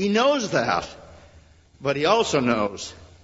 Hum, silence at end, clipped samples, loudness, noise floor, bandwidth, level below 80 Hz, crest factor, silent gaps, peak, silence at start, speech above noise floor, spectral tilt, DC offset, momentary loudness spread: none; 0.15 s; under 0.1%; -22 LUFS; -52 dBFS; 8 kHz; -54 dBFS; 20 dB; none; -4 dBFS; 0 s; 30 dB; -4.5 dB/octave; under 0.1%; 15 LU